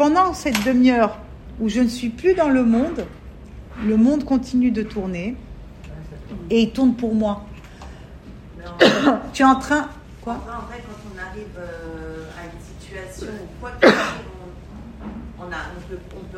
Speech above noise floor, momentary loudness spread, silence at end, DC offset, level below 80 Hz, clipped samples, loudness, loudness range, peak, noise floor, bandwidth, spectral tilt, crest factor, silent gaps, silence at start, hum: 20 dB; 23 LU; 0 s; under 0.1%; -40 dBFS; under 0.1%; -19 LUFS; 7 LU; 0 dBFS; -39 dBFS; 13.5 kHz; -5.5 dB/octave; 20 dB; none; 0 s; none